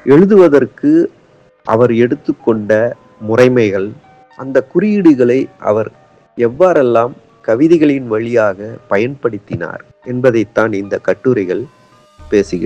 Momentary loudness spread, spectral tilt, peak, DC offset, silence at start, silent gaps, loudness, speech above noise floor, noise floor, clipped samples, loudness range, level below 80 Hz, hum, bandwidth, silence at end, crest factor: 14 LU; -8 dB/octave; 0 dBFS; under 0.1%; 0.05 s; none; -13 LUFS; 28 dB; -40 dBFS; 0.4%; 4 LU; -48 dBFS; none; 8.6 kHz; 0 s; 12 dB